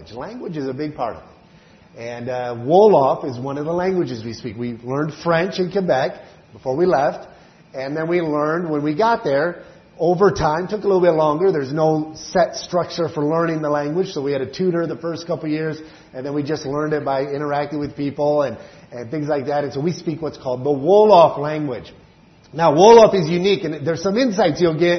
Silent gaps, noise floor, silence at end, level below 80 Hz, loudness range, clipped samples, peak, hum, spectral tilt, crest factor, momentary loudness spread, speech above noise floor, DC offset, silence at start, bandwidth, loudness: none; -49 dBFS; 0 s; -52 dBFS; 8 LU; under 0.1%; 0 dBFS; none; -6.5 dB/octave; 18 dB; 15 LU; 31 dB; under 0.1%; 0 s; 6.4 kHz; -19 LUFS